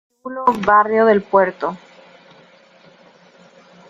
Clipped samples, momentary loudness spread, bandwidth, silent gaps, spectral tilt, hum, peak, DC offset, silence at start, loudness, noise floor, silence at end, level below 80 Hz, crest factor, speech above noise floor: under 0.1%; 14 LU; 7.6 kHz; none; -7 dB/octave; none; -2 dBFS; under 0.1%; 0.25 s; -16 LUFS; -49 dBFS; 2.1 s; -58 dBFS; 18 dB; 33 dB